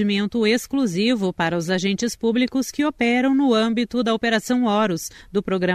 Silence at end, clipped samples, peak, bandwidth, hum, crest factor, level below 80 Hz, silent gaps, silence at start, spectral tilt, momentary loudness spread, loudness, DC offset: 0 s; under 0.1%; -6 dBFS; 15 kHz; none; 14 dB; -54 dBFS; none; 0 s; -5 dB/octave; 5 LU; -21 LUFS; under 0.1%